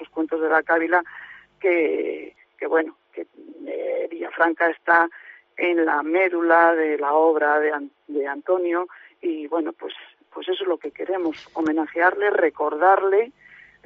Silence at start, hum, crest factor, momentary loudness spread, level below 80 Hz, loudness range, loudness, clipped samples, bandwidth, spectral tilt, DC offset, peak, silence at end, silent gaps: 0 s; none; 18 dB; 17 LU; -72 dBFS; 7 LU; -21 LUFS; under 0.1%; 5.4 kHz; -0.5 dB/octave; under 0.1%; -4 dBFS; 0.55 s; none